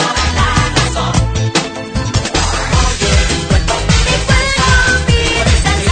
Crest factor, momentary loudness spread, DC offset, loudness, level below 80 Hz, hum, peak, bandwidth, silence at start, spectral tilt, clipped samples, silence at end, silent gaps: 12 dB; 5 LU; under 0.1%; -13 LUFS; -18 dBFS; none; 0 dBFS; 9.4 kHz; 0 s; -4 dB/octave; under 0.1%; 0 s; none